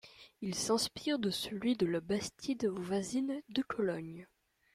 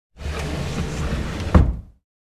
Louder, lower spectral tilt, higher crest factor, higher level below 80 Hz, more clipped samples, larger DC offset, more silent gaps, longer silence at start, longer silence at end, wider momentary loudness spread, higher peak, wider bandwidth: second, -36 LUFS vs -23 LUFS; second, -4.5 dB/octave vs -6.5 dB/octave; second, 16 dB vs 22 dB; second, -68 dBFS vs -24 dBFS; neither; neither; neither; about the same, 0.05 s vs 0.15 s; about the same, 0.5 s vs 0.45 s; about the same, 10 LU vs 12 LU; second, -20 dBFS vs 0 dBFS; first, 15.5 kHz vs 13 kHz